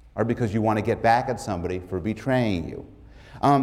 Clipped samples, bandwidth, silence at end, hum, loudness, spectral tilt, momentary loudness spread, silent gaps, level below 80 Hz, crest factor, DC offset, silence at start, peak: under 0.1%; 14.5 kHz; 0 s; none; -25 LUFS; -7 dB/octave; 9 LU; none; -48 dBFS; 16 dB; under 0.1%; 0.05 s; -8 dBFS